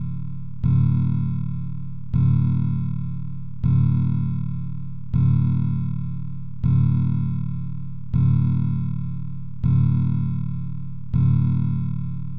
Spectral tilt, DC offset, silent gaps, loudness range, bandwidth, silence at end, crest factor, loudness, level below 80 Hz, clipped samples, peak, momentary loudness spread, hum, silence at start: -12.5 dB/octave; 3%; none; 0 LU; 3.6 kHz; 0 s; 12 dB; -23 LUFS; -38 dBFS; under 0.1%; -10 dBFS; 13 LU; none; 0 s